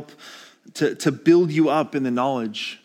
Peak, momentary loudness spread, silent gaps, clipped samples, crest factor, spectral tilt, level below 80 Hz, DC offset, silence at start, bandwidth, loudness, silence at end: -4 dBFS; 23 LU; none; under 0.1%; 16 dB; -6 dB/octave; -80 dBFS; under 0.1%; 0 s; 14.5 kHz; -21 LUFS; 0.1 s